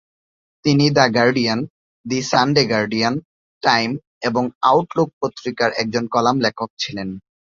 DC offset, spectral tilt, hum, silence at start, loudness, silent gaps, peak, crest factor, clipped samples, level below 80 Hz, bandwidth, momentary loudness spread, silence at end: under 0.1%; -5 dB/octave; none; 0.65 s; -19 LUFS; 1.70-2.04 s, 3.25-3.61 s, 4.07-4.21 s, 4.55-4.61 s, 5.13-5.21 s, 6.70-6.77 s; -2 dBFS; 18 dB; under 0.1%; -56 dBFS; 7.6 kHz; 10 LU; 0.35 s